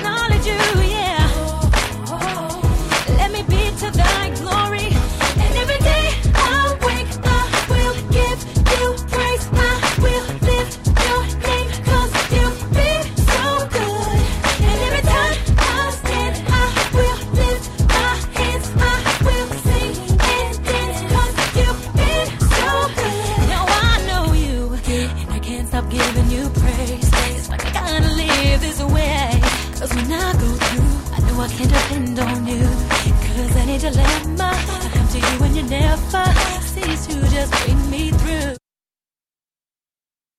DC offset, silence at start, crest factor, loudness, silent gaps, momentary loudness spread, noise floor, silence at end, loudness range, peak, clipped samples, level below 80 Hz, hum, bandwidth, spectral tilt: under 0.1%; 0 s; 14 dB; -18 LUFS; none; 4 LU; under -90 dBFS; 1.8 s; 2 LU; -2 dBFS; under 0.1%; -20 dBFS; none; 15.5 kHz; -4.5 dB/octave